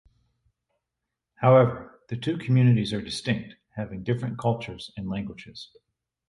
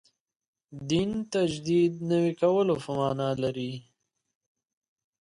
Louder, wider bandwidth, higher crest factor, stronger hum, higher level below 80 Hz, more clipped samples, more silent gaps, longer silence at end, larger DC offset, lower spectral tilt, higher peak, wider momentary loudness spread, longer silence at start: about the same, -25 LUFS vs -27 LUFS; about the same, 11.5 kHz vs 11 kHz; about the same, 20 dB vs 16 dB; neither; about the same, -56 dBFS vs -60 dBFS; neither; neither; second, 0.65 s vs 1.45 s; neither; about the same, -7.5 dB/octave vs -6.5 dB/octave; first, -6 dBFS vs -12 dBFS; first, 20 LU vs 10 LU; first, 1.4 s vs 0.7 s